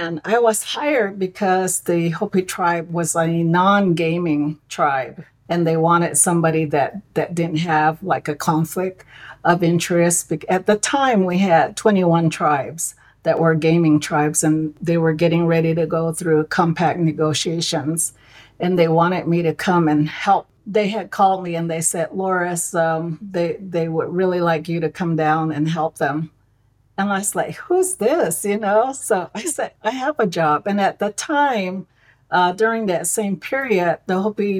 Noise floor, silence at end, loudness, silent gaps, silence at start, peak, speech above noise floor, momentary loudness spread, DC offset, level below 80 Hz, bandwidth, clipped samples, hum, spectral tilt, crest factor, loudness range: -58 dBFS; 0 s; -19 LUFS; none; 0 s; -2 dBFS; 40 dB; 7 LU; under 0.1%; -58 dBFS; 16.5 kHz; under 0.1%; none; -5 dB/octave; 16 dB; 3 LU